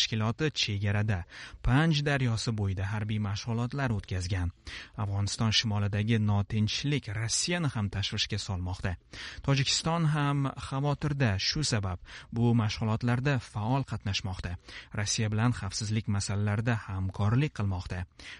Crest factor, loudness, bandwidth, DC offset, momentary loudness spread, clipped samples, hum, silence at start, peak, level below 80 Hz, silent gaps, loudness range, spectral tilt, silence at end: 16 dB; -30 LUFS; 11 kHz; under 0.1%; 10 LU; under 0.1%; none; 0 s; -12 dBFS; -48 dBFS; none; 2 LU; -5 dB/octave; 0 s